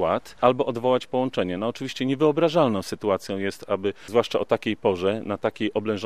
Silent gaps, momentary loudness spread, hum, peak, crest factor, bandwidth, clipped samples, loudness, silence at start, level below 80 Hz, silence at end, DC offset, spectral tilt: none; 7 LU; none; -2 dBFS; 22 dB; 14.5 kHz; under 0.1%; -24 LUFS; 0 s; -62 dBFS; 0 s; 0.4%; -6 dB/octave